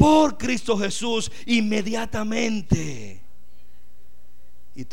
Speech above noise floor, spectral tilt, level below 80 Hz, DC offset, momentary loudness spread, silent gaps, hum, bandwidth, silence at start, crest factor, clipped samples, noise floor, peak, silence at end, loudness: 33 dB; -5 dB/octave; -42 dBFS; 4%; 13 LU; none; 60 Hz at -45 dBFS; 16 kHz; 0 s; 22 dB; under 0.1%; -57 dBFS; -2 dBFS; 0.05 s; -23 LUFS